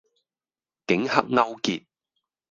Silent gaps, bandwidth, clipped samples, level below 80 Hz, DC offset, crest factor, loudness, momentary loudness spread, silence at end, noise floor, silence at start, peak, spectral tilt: none; 7.6 kHz; under 0.1%; -68 dBFS; under 0.1%; 26 dB; -24 LUFS; 12 LU; 0.75 s; under -90 dBFS; 0.9 s; 0 dBFS; -4.5 dB/octave